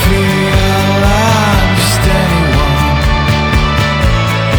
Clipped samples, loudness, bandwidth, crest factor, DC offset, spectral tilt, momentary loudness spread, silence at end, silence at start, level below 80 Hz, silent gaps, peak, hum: under 0.1%; -11 LUFS; over 20 kHz; 10 dB; under 0.1%; -5 dB/octave; 2 LU; 0 s; 0 s; -16 dBFS; none; 0 dBFS; none